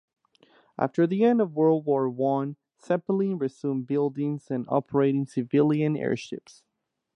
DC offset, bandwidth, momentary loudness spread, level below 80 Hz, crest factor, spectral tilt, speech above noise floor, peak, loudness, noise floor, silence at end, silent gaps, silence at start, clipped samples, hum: under 0.1%; 10 kHz; 9 LU; -72 dBFS; 18 dB; -8.5 dB/octave; 36 dB; -8 dBFS; -26 LUFS; -61 dBFS; 0.65 s; none; 0.8 s; under 0.1%; none